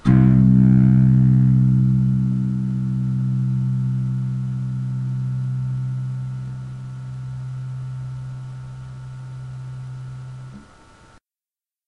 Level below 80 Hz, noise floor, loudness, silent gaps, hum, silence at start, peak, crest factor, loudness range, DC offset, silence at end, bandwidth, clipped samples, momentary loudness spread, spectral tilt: -40 dBFS; under -90 dBFS; -19 LUFS; none; none; 0.05 s; -2 dBFS; 16 dB; 17 LU; under 0.1%; 1.25 s; 2.6 kHz; under 0.1%; 21 LU; -10.5 dB/octave